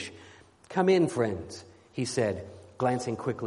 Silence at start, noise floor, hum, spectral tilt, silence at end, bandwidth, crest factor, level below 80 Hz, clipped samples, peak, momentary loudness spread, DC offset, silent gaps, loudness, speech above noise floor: 0 s; -54 dBFS; none; -5.5 dB/octave; 0 s; 11.5 kHz; 20 dB; -62 dBFS; under 0.1%; -10 dBFS; 18 LU; under 0.1%; none; -29 LUFS; 26 dB